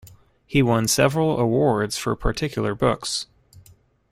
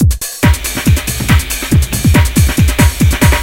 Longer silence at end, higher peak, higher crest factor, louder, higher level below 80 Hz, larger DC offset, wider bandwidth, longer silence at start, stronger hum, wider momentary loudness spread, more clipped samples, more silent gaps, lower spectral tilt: first, 0.85 s vs 0 s; second, -4 dBFS vs 0 dBFS; first, 18 dB vs 10 dB; second, -22 LUFS vs -12 LUFS; second, -38 dBFS vs -16 dBFS; second, under 0.1% vs 0.5%; about the same, 16 kHz vs 17 kHz; about the same, 0.05 s vs 0 s; neither; first, 7 LU vs 3 LU; second, under 0.1% vs 0.1%; neither; about the same, -5 dB/octave vs -4.5 dB/octave